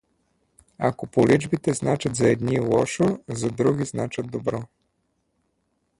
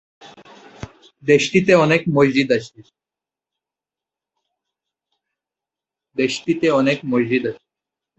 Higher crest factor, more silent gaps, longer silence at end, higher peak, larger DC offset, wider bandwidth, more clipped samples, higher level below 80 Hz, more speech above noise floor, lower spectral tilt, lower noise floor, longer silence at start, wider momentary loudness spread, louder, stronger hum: about the same, 20 dB vs 20 dB; neither; first, 1.35 s vs 0.65 s; about the same, -4 dBFS vs -2 dBFS; neither; first, 11.5 kHz vs 8.2 kHz; neither; about the same, -54 dBFS vs -58 dBFS; second, 50 dB vs 71 dB; about the same, -6 dB/octave vs -5.5 dB/octave; second, -72 dBFS vs -88 dBFS; first, 0.8 s vs 0.25 s; second, 9 LU vs 19 LU; second, -23 LUFS vs -17 LUFS; neither